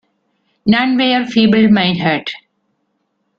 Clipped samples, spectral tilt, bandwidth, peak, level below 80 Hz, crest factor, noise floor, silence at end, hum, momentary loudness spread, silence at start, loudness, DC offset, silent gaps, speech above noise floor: under 0.1%; -7 dB/octave; 6.8 kHz; 0 dBFS; -52 dBFS; 14 dB; -67 dBFS; 1 s; none; 11 LU; 0.65 s; -13 LUFS; under 0.1%; none; 54 dB